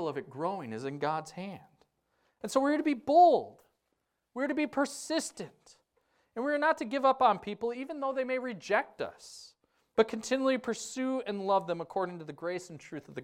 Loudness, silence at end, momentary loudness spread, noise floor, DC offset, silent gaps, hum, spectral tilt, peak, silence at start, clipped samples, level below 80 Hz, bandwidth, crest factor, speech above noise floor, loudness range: -31 LUFS; 0 s; 18 LU; -81 dBFS; under 0.1%; none; none; -4.5 dB/octave; -12 dBFS; 0 s; under 0.1%; -74 dBFS; 15.5 kHz; 20 dB; 50 dB; 4 LU